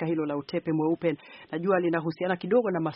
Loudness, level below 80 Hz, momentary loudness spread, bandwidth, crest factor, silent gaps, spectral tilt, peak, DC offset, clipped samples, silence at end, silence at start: -28 LUFS; -70 dBFS; 6 LU; 5.8 kHz; 16 dB; none; -6 dB/octave; -10 dBFS; under 0.1%; under 0.1%; 0 s; 0 s